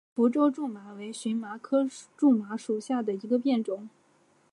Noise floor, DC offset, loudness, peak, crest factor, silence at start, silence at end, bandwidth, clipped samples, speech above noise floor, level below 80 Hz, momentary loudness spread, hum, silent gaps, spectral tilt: -65 dBFS; under 0.1%; -28 LUFS; -12 dBFS; 16 dB; 0.15 s; 0.65 s; 11.5 kHz; under 0.1%; 37 dB; -86 dBFS; 12 LU; none; none; -6 dB/octave